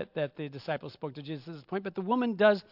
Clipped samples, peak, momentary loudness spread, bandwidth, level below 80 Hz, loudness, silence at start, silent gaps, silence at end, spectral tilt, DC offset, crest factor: under 0.1%; -12 dBFS; 16 LU; 5.8 kHz; -78 dBFS; -32 LUFS; 0 s; none; 0.1 s; -8 dB/octave; under 0.1%; 20 dB